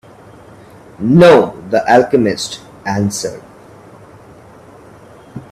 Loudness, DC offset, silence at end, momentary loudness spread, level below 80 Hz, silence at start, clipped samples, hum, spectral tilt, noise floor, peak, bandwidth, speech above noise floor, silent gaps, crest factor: -13 LUFS; under 0.1%; 0.1 s; 20 LU; -50 dBFS; 1 s; under 0.1%; none; -5.5 dB/octave; -39 dBFS; 0 dBFS; 14 kHz; 28 dB; none; 16 dB